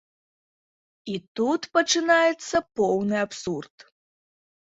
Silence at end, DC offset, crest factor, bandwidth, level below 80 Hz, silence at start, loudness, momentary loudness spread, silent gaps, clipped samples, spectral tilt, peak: 1.05 s; under 0.1%; 20 dB; 8 kHz; -64 dBFS; 1.05 s; -24 LUFS; 14 LU; 1.28-1.35 s; under 0.1%; -3.5 dB/octave; -6 dBFS